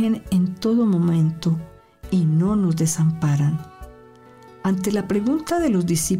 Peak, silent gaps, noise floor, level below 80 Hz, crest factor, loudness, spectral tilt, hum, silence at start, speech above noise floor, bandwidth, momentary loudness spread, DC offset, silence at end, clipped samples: -12 dBFS; none; -46 dBFS; -46 dBFS; 10 dB; -21 LUFS; -6.5 dB/octave; none; 0 s; 27 dB; 16 kHz; 6 LU; under 0.1%; 0 s; under 0.1%